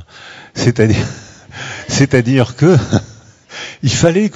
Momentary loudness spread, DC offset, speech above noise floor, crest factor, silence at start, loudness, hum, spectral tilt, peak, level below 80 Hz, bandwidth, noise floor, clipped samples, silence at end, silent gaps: 21 LU; under 0.1%; 25 dB; 14 dB; 0 s; -13 LUFS; none; -5.5 dB/octave; 0 dBFS; -40 dBFS; 8.2 kHz; -37 dBFS; 0.3%; 0.05 s; none